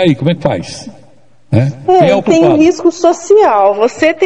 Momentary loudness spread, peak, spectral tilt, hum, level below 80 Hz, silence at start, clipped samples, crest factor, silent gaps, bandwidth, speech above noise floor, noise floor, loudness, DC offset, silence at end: 8 LU; 0 dBFS; -6.5 dB/octave; none; -48 dBFS; 0 s; 0.6%; 10 dB; none; 9.8 kHz; 37 dB; -47 dBFS; -10 LUFS; 0.9%; 0 s